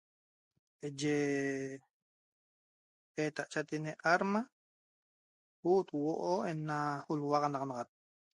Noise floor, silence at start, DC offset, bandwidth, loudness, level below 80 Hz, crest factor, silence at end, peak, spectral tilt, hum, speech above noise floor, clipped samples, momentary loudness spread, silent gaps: under -90 dBFS; 0.85 s; under 0.1%; 11.5 kHz; -36 LUFS; -82 dBFS; 22 dB; 0.55 s; -16 dBFS; -5.5 dB/octave; none; over 55 dB; under 0.1%; 14 LU; 1.90-3.15 s, 4.52-5.63 s